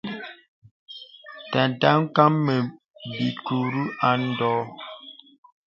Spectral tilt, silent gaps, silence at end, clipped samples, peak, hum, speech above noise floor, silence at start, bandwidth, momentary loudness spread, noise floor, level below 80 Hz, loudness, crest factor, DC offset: -8 dB/octave; 0.48-0.62 s, 0.71-0.87 s; 0.55 s; under 0.1%; 0 dBFS; none; 21 dB; 0.05 s; 7 kHz; 22 LU; -44 dBFS; -68 dBFS; -23 LUFS; 24 dB; under 0.1%